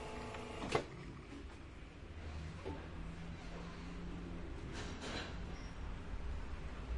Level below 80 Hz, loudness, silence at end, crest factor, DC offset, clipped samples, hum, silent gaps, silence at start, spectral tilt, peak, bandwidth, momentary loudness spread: -50 dBFS; -47 LUFS; 0 s; 28 dB; under 0.1%; under 0.1%; none; none; 0 s; -5.5 dB/octave; -16 dBFS; 11.5 kHz; 10 LU